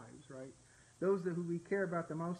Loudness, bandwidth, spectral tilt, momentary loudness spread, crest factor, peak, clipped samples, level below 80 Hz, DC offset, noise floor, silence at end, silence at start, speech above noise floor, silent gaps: -38 LUFS; 10.5 kHz; -7.5 dB/octave; 16 LU; 16 dB; -24 dBFS; under 0.1%; -76 dBFS; under 0.1%; -64 dBFS; 0 s; 0 s; 27 dB; none